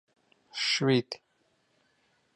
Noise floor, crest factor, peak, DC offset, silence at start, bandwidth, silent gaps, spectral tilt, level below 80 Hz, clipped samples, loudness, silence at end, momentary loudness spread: -72 dBFS; 20 dB; -14 dBFS; under 0.1%; 0.55 s; 11.5 kHz; none; -4.5 dB/octave; -78 dBFS; under 0.1%; -27 LUFS; 1.2 s; 17 LU